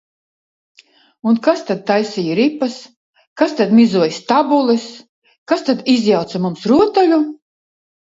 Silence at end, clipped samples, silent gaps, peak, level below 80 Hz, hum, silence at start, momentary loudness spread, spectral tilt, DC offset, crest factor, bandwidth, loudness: 0.85 s; under 0.1%; 2.97-3.13 s, 3.27-3.36 s, 5.09-5.22 s, 5.38-5.46 s; 0 dBFS; -60 dBFS; none; 1.25 s; 10 LU; -6 dB/octave; under 0.1%; 16 dB; 7.8 kHz; -15 LUFS